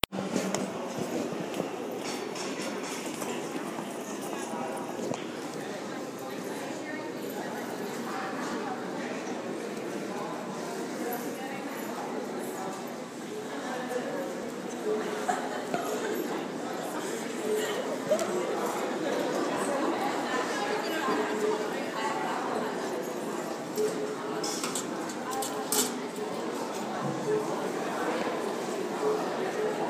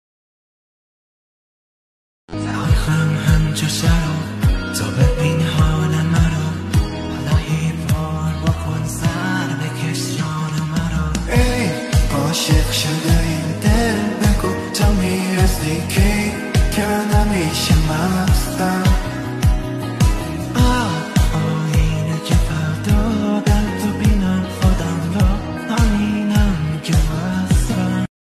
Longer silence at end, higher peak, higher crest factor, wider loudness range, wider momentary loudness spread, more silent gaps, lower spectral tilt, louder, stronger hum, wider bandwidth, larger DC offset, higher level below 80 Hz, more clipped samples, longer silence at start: second, 0 s vs 0.2 s; about the same, -2 dBFS vs -2 dBFS; first, 30 dB vs 16 dB; first, 6 LU vs 3 LU; about the same, 7 LU vs 5 LU; neither; second, -3.5 dB/octave vs -5.5 dB/octave; second, -33 LUFS vs -18 LUFS; neither; first, 16 kHz vs 14 kHz; neither; second, -70 dBFS vs -22 dBFS; neither; second, 0.1 s vs 2.3 s